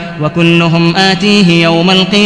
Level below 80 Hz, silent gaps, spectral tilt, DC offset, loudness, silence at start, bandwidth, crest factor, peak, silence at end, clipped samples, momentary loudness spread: -40 dBFS; none; -5.5 dB/octave; 0.2%; -8 LUFS; 0 s; 11 kHz; 8 dB; 0 dBFS; 0 s; 1%; 3 LU